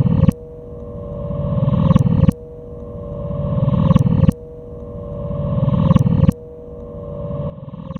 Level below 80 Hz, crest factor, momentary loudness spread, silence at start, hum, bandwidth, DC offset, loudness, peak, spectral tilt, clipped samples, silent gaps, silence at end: -30 dBFS; 18 dB; 20 LU; 0 s; none; 10 kHz; under 0.1%; -17 LUFS; 0 dBFS; -10 dB/octave; under 0.1%; none; 0 s